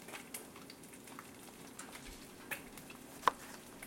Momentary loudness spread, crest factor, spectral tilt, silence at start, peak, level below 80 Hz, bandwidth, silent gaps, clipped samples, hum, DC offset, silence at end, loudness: 16 LU; 32 dB; -2.5 dB/octave; 0 s; -14 dBFS; -68 dBFS; 16.5 kHz; none; under 0.1%; none; under 0.1%; 0 s; -45 LUFS